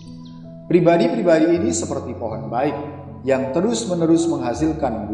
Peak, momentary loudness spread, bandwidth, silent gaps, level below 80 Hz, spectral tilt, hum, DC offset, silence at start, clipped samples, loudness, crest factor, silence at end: -2 dBFS; 15 LU; 11 kHz; none; -46 dBFS; -6 dB/octave; none; under 0.1%; 0 s; under 0.1%; -19 LUFS; 18 dB; 0 s